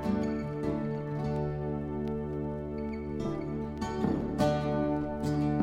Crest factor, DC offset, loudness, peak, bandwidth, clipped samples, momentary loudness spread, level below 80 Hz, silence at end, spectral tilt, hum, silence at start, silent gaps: 16 dB; under 0.1%; -33 LUFS; -14 dBFS; 12 kHz; under 0.1%; 7 LU; -46 dBFS; 0 s; -8 dB/octave; none; 0 s; none